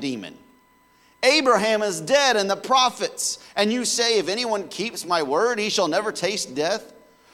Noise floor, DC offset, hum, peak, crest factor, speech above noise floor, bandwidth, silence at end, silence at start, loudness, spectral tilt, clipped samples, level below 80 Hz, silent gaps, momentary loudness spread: -58 dBFS; under 0.1%; none; -6 dBFS; 18 dB; 36 dB; 17 kHz; 0.45 s; 0 s; -21 LUFS; -2 dB/octave; under 0.1%; -70 dBFS; none; 8 LU